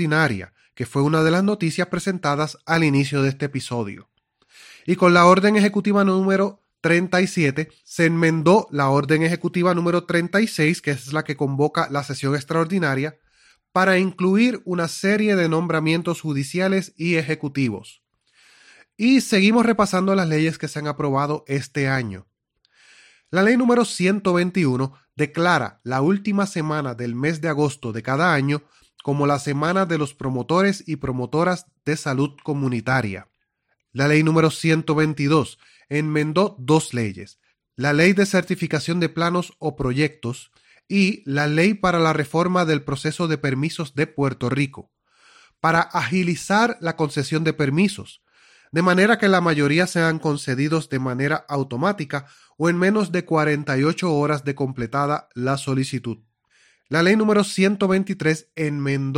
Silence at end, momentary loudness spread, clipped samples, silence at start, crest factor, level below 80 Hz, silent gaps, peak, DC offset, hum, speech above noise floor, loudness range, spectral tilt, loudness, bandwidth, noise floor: 0 s; 9 LU; under 0.1%; 0 s; 20 dB; -56 dBFS; none; 0 dBFS; under 0.1%; none; 53 dB; 4 LU; -6 dB/octave; -21 LUFS; 16 kHz; -73 dBFS